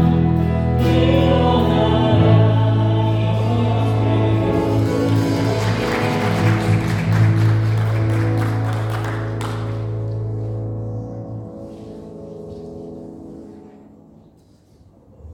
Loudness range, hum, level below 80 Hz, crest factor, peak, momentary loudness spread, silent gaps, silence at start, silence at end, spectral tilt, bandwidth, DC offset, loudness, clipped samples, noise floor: 19 LU; none; -38 dBFS; 16 dB; -2 dBFS; 19 LU; none; 0 s; 0 s; -7.5 dB/octave; 11.5 kHz; under 0.1%; -18 LUFS; under 0.1%; -51 dBFS